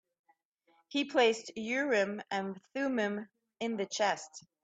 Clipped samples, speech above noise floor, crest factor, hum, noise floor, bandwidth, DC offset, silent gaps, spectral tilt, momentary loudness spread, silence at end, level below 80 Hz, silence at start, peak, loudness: under 0.1%; 39 dB; 20 dB; none; -72 dBFS; 9 kHz; under 0.1%; none; -3.5 dB/octave; 12 LU; 0.25 s; -80 dBFS; 0.9 s; -14 dBFS; -33 LUFS